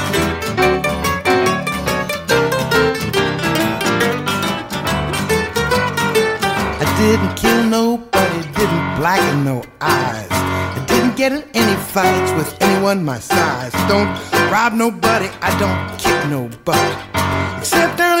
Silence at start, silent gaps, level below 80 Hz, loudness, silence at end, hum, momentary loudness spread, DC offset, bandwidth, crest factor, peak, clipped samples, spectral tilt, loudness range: 0 s; none; -38 dBFS; -16 LUFS; 0 s; none; 5 LU; under 0.1%; 16.5 kHz; 14 dB; -2 dBFS; under 0.1%; -4.5 dB/octave; 1 LU